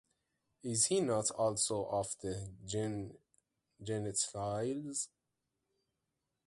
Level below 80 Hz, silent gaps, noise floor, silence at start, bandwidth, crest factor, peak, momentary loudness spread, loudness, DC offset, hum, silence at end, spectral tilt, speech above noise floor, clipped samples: -66 dBFS; none; -87 dBFS; 0.65 s; 11.5 kHz; 20 dB; -18 dBFS; 13 LU; -36 LUFS; under 0.1%; none; 1.4 s; -4 dB/octave; 50 dB; under 0.1%